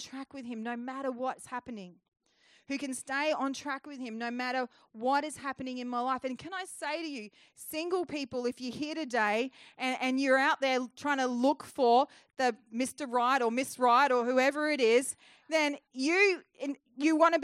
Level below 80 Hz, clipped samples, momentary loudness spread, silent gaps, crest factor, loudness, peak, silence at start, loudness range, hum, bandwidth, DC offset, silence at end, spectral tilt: -80 dBFS; under 0.1%; 14 LU; 2.08-2.12 s; 18 dB; -31 LUFS; -12 dBFS; 0 s; 8 LU; none; 14.5 kHz; under 0.1%; 0 s; -3 dB/octave